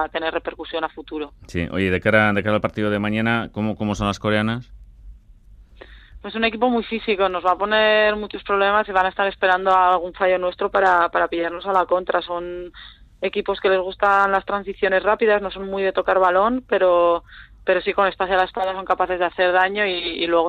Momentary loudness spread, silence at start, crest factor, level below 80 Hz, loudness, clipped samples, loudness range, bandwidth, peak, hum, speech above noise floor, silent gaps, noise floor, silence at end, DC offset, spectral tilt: 11 LU; 0 s; 18 dB; -46 dBFS; -20 LUFS; under 0.1%; 6 LU; 10.5 kHz; -2 dBFS; none; 27 dB; none; -47 dBFS; 0 s; under 0.1%; -6 dB/octave